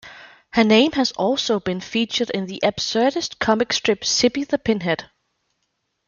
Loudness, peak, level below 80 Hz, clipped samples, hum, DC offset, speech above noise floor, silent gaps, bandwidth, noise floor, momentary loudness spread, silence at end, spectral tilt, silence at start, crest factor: -20 LUFS; -2 dBFS; -56 dBFS; under 0.1%; none; under 0.1%; 54 dB; none; 7.4 kHz; -73 dBFS; 8 LU; 1.05 s; -3.5 dB/octave; 0.05 s; 18 dB